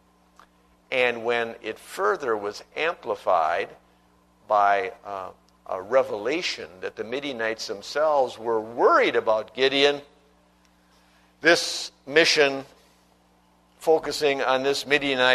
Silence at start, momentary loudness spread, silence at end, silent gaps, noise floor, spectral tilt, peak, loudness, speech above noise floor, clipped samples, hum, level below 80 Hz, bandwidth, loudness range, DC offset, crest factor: 0.9 s; 15 LU; 0 s; none; -60 dBFS; -2.5 dB/octave; -2 dBFS; -23 LUFS; 37 dB; under 0.1%; 60 Hz at -65 dBFS; -64 dBFS; 13.5 kHz; 4 LU; under 0.1%; 22 dB